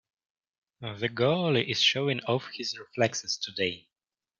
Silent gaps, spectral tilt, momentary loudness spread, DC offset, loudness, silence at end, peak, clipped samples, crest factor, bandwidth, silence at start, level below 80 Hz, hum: none; -4 dB/octave; 11 LU; under 0.1%; -28 LUFS; 0.6 s; -10 dBFS; under 0.1%; 20 dB; 7.6 kHz; 0.8 s; -70 dBFS; none